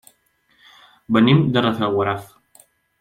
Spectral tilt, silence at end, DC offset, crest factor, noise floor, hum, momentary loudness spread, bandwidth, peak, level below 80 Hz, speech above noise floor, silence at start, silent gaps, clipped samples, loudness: -7.5 dB/octave; 0.75 s; under 0.1%; 20 dB; -62 dBFS; none; 9 LU; 15 kHz; -2 dBFS; -56 dBFS; 45 dB; 1.1 s; none; under 0.1%; -18 LUFS